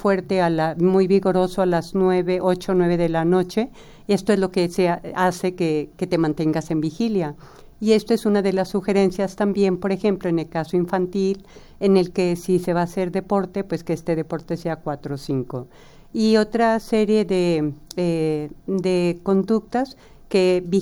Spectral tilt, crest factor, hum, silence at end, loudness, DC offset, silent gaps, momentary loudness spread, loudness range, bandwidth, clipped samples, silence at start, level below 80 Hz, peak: -7 dB/octave; 16 dB; none; 0 s; -21 LUFS; under 0.1%; none; 8 LU; 3 LU; 17 kHz; under 0.1%; 0 s; -48 dBFS; -4 dBFS